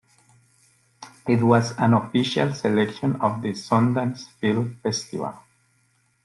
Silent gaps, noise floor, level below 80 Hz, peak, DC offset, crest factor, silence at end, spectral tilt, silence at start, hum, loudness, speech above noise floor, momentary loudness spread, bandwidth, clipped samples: none; -65 dBFS; -62 dBFS; -4 dBFS; under 0.1%; 20 dB; 0.85 s; -6 dB/octave; 1 s; none; -23 LUFS; 43 dB; 10 LU; 11.5 kHz; under 0.1%